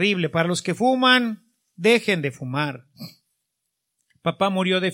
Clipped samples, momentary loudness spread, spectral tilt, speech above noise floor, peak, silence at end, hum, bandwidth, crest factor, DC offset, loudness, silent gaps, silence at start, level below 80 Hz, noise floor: under 0.1%; 21 LU; -4.5 dB/octave; 58 dB; -4 dBFS; 0 s; none; 16.5 kHz; 20 dB; under 0.1%; -21 LUFS; none; 0 s; -68 dBFS; -79 dBFS